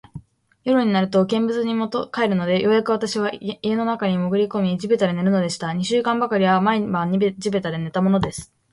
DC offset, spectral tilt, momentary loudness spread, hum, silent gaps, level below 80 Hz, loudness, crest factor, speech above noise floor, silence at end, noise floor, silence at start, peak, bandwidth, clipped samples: under 0.1%; -6 dB/octave; 6 LU; none; none; -54 dBFS; -21 LUFS; 14 dB; 23 dB; 0.3 s; -43 dBFS; 0.15 s; -6 dBFS; 11.5 kHz; under 0.1%